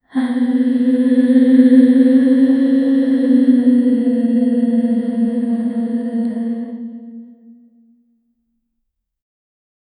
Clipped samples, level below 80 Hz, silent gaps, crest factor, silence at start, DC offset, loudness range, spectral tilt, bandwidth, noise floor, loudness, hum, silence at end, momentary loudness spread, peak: under 0.1%; -66 dBFS; none; 14 dB; 0.15 s; under 0.1%; 14 LU; -8 dB/octave; 9.6 kHz; -73 dBFS; -14 LUFS; none; 2.75 s; 11 LU; 0 dBFS